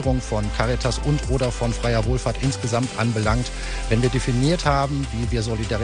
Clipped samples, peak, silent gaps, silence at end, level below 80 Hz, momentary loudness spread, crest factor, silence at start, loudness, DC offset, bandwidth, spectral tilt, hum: under 0.1%; -4 dBFS; none; 0 s; -28 dBFS; 4 LU; 16 dB; 0 s; -22 LUFS; under 0.1%; 10 kHz; -5.5 dB/octave; none